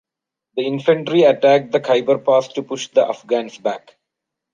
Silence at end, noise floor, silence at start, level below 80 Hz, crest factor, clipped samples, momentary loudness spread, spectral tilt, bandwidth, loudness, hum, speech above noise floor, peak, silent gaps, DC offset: 0.75 s; -82 dBFS; 0.55 s; -70 dBFS; 16 dB; under 0.1%; 12 LU; -5.5 dB/octave; 7.4 kHz; -17 LUFS; none; 65 dB; -2 dBFS; none; under 0.1%